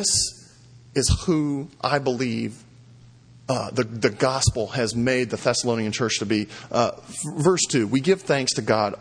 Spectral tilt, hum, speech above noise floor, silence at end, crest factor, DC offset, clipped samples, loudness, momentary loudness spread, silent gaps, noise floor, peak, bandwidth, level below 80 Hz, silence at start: -4 dB/octave; none; 26 dB; 0 s; 20 dB; under 0.1%; under 0.1%; -23 LUFS; 7 LU; none; -49 dBFS; -2 dBFS; 10.5 kHz; -42 dBFS; 0 s